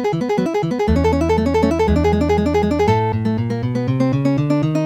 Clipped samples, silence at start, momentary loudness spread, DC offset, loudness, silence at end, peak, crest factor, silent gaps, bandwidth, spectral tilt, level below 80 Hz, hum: under 0.1%; 0 s; 4 LU; under 0.1%; -17 LUFS; 0 s; -4 dBFS; 14 dB; none; 14.5 kHz; -8 dB/octave; -30 dBFS; none